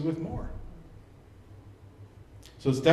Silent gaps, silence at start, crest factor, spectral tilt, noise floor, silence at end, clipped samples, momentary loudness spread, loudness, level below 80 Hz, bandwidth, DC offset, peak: none; 0 s; 24 dB; -6.5 dB/octave; -52 dBFS; 0 s; under 0.1%; 22 LU; -32 LUFS; -48 dBFS; 13 kHz; under 0.1%; -6 dBFS